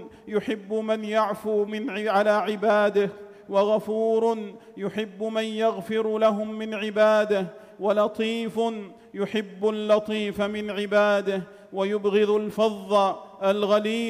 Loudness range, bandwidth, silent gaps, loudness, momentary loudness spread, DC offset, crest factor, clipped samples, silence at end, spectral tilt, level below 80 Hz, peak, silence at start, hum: 2 LU; 14 kHz; none; -25 LUFS; 9 LU; under 0.1%; 14 dB; under 0.1%; 0 s; -5.5 dB/octave; -68 dBFS; -10 dBFS; 0 s; none